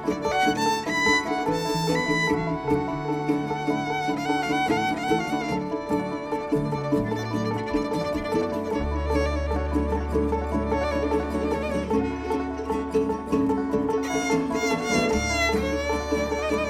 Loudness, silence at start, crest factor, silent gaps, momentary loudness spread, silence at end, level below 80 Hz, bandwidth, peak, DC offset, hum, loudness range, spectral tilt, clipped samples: -25 LUFS; 0 s; 16 dB; none; 5 LU; 0 s; -38 dBFS; 17.5 kHz; -8 dBFS; under 0.1%; none; 2 LU; -5 dB/octave; under 0.1%